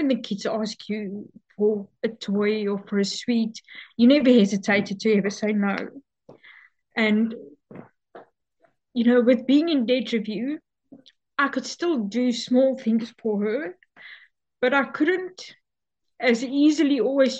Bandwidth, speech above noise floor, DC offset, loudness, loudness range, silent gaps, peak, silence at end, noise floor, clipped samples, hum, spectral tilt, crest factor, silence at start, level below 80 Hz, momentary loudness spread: 8.4 kHz; 61 dB; under 0.1%; -23 LUFS; 5 LU; none; -6 dBFS; 0 s; -83 dBFS; under 0.1%; none; -5.5 dB/octave; 18 dB; 0 s; -74 dBFS; 13 LU